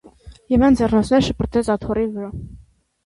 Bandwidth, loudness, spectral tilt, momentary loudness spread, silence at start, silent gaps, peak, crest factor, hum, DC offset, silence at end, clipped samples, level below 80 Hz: 11.5 kHz; -18 LUFS; -6.5 dB/octave; 14 LU; 0.25 s; none; -4 dBFS; 14 dB; none; under 0.1%; 0.45 s; under 0.1%; -36 dBFS